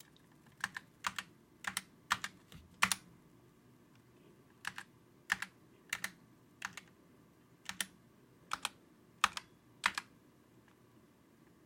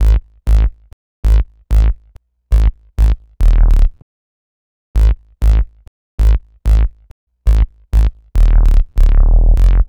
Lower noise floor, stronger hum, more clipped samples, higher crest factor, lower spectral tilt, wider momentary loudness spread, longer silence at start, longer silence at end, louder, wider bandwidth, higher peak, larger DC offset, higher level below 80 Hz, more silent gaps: first, -65 dBFS vs -44 dBFS; neither; neither; first, 34 dB vs 12 dB; second, -0.5 dB/octave vs -7.5 dB/octave; first, 22 LU vs 7 LU; first, 0.6 s vs 0 s; first, 1.6 s vs 0.05 s; second, -40 LUFS vs -16 LUFS; first, 16.5 kHz vs 4.7 kHz; second, -12 dBFS vs 0 dBFS; neither; second, -76 dBFS vs -12 dBFS; second, none vs 0.93-1.23 s, 4.02-4.94 s, 5.88-6.18 s, 7.11-7.27 s